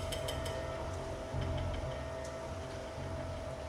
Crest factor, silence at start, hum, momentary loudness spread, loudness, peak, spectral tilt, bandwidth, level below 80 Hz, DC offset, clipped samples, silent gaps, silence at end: 14 dB; 0 s; none; 5 LU; -40 LUFS; -26 dBFS; -5 dB/octave; 15.5 kHz; -48 dBFS; under 0.1%; under 0.1%; none; 0 s